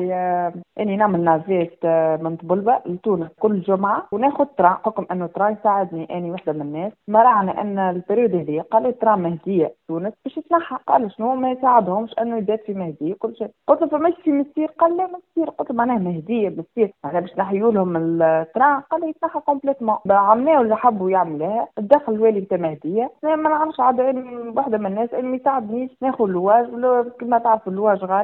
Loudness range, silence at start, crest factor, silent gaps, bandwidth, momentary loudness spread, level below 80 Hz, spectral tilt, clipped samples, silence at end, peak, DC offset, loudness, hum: 3 LU; 0 s; 20 dB; none; 4.1 kHz; 9 LU; -64 dBFS; -11 dB/octave; under 0.1%; 0 s; 0 dBFS; under 0.1%; -20 LUFS; none